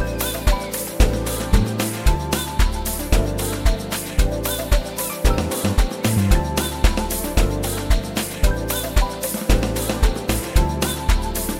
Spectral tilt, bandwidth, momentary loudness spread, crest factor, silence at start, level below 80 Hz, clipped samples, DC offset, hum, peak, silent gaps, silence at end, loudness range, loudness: -4.5 dB/octave; 17 kHz; 4 LU; 18 dB; 0 s; -22 dBFS; under 0.1%; 0.2%; none; 0 dBFS; none; 0 s; 1 LU; -21 LUFS